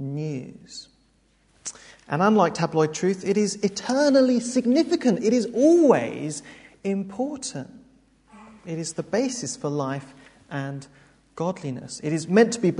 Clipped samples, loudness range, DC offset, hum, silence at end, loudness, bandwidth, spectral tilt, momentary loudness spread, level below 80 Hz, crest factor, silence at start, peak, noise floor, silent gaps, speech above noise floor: under 0.1%; 10 LU; under 0.1%; none; 0 s; -23 LUFS; 11 kHz; -5.5 dB/octave; 18 LU; -64 dBFS; 20 dB; 0 s; -4 dBFS; -62 dBFS; none; 40 dB